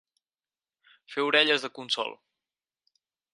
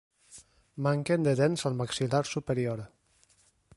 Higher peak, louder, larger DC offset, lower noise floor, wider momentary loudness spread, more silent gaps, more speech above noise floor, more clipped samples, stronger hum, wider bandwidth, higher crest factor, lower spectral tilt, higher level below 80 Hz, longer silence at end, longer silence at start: first, -6 dBFS vs -12 dBFS; first, -26 LUFS vs -29 LUFS; neither; first, under -90 dBFS vs -66 dBFS; about the same, 13 LU vs 12 LU; neither; first, over 63 dB vs 38 dB; neither; neither; about the same, 11.5 kHz vs 11.5 kHz; first, 24 dB vs 18 dB; second, -2 dB/octave vs -6 dB/octave; second, -86 dBFS vs -62 dBFS; first, 1.2 s vs 0.9 s; first, 1.1 s vs 0.3 s